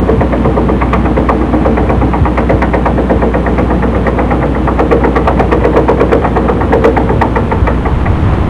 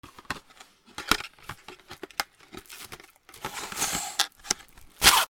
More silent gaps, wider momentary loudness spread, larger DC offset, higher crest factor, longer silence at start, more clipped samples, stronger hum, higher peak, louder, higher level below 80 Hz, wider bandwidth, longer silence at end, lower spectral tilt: neither; second, 3 LU vs 17 LU; neither; second, 10 dB vs 30 dB; about the same, 0 s vs 0.05 s; first, 1% vs under 0.1%; neither; about the same, 0 dBFS vs 0 dBFS; first, -10 LUFS vs -28 LUFS; first, -14 dBFS vs -50 dBFS; second, 7 kHz vs over 20 kHz; about the same, 0 s vs 0.05 s; first, -9 dB/octave vs 0 dB/octave